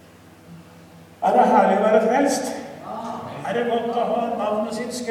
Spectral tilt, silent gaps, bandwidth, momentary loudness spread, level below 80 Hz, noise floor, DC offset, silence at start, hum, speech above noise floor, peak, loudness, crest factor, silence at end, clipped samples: -5 dB/octave; none; 15 kHz; 15 LU; -64 dBFS; -47 dBFS; under 0.1%; 0.5 s; none; 26 dB; -4 dBFS; -21 LUFS; 18 dB; 0 s; under 0.1%